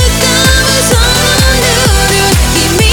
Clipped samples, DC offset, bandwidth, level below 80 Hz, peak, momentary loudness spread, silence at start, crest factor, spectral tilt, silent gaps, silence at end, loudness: 0.2%; under 0.1%; over 20 kHz; -14 dBFS; 0 dBFS; 1 LU; 0 s; 8 dB; -3 dB/octave; none; 0 s; -7 LUFS